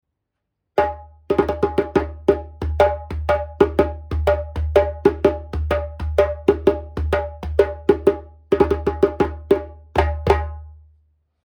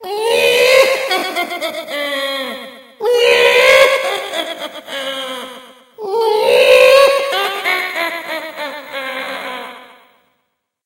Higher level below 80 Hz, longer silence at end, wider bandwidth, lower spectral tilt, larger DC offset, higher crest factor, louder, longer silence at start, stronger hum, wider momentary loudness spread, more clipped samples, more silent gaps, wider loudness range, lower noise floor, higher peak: first, -30 dBFS vs -60 dBFS; second, 0.7 s vs 1 s; about the same, 17 kHz vs 16.5 kHz; first, -8 dB/octave vs -0.5 dB/octave; neither; first, 20 dB vs 14 dB; second, -20 LUFS vs -13 LUFS; first, 0.75 s vs 0 s; neither; second, 6 LU vs 18 LU; neither; neither; second, 1 LU vs 5 LU; first, -78 dBFS vs -69 dBFS; about the same, 0 dBFS vs 0 dBFS